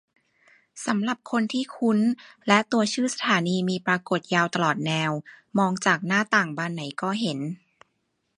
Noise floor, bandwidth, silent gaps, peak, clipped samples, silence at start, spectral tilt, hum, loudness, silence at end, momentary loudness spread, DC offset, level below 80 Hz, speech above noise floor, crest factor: -75 dBFS; 11.5 kHz; none; -2 dBFS; under 0.1%; 0.75 s; -4.5 dB/octave; none; -24 LUFS; 0.8 s; 9 LU; under 0.1%; -72 dBFS; 50 dB; 24 dB